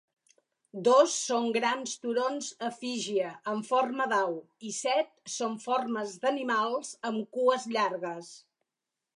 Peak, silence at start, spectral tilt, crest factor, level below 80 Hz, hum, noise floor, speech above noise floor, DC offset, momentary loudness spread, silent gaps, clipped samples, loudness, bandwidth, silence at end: -10 dBFS; 0.75 s; -2.5 dB/octave; 20 dB; -86 dBFS; none; -88 dBFS; 59 dB; under 0.1%; 10 LU; none; under 0.1%; -30 LUFS; 11.5 kHz; 0.8 s